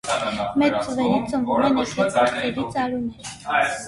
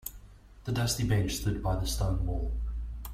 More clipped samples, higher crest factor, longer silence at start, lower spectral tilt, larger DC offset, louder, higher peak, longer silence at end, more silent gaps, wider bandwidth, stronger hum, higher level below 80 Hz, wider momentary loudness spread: neither; about the same, 16 dB vs 14 dB; about the same, 0.05 s vs 0.05 s; about the same, -4.5 dB/octave vs -5 dB/octave; neither; first, -22 LUFS vs -32 LUFS; first, -6 dBFS vs -16 dBFS; about the same, 0 s vs 0 s; neither; second, 11.5 kHz vs 16 kHz; neither; second, -52 dBFS vs -36 dBFS; second, 6 LU vs 11 LU